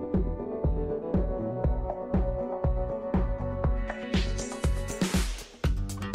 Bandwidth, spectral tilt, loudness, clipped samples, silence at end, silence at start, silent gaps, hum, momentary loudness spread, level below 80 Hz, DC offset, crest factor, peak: 15 kHz; -6 dB/octave; -31 LUFS; under 0.1%; 0 s; 0 s; none; none; 4 LU; -32 dBFS; under 0.1%; 12 dB; -16 dBFS